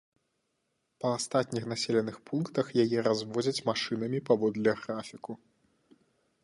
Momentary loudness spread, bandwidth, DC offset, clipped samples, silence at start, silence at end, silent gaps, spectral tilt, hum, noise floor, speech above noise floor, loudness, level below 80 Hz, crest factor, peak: 11 LU; 11.5 kHz; under 0.1%; under 0.1%; 1 s; 1.05 s; none; -5 dB/octave; none; -79 dBFS; 49 dB; -30 LUFS; -72 dBFS; 20 dB; -12 dBFS